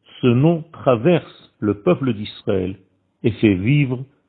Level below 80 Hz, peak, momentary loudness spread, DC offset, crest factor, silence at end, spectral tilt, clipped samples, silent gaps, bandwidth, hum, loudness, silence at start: -54 dBFS; -2 dBFS; 8 LU; under 0.1%; 18 dB; 0.25 s; -12.5 dB/octave; under 0.1%; none; 4.5 kHz; none; -19 LUFS; 0.25 s